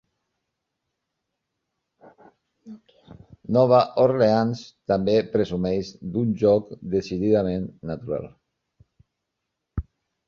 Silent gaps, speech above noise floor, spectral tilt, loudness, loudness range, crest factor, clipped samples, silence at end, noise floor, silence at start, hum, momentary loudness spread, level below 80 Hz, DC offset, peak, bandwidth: none; 60 dB; -8 dB/octave; -23 LUFS; 7 LU; 20 dB; under 0.1%; 0.45 s; -81 dBFS; 2.65 s; none; 17 LU; -48 dBFS; under 0.1%; -4 dBFS; 7.2 kHz